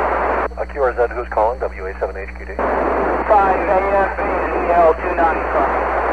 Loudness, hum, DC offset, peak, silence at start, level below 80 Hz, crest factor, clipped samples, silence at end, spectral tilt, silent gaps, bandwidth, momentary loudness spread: -17 LUFS; none; 0.7%; -2 dBFS; 0 s; -32 dBFS; 14 dB; under 0.1%; 0 s; -7.5 dB/octave; none; 9.4 kHz; 11 LU